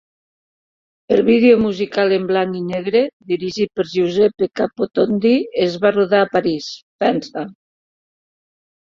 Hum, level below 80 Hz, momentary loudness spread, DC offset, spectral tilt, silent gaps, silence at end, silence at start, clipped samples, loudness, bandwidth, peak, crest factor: none; -56 dBFS; 9 LU; under 0.1%; -6.5 dB/octave; 3.13-3.20 s, 6.82-6.99 s; 1.3 s; 1.1 s; under 0.1%; -17 LUFS; 7.4 kHz; -2 dBFS; 16 dB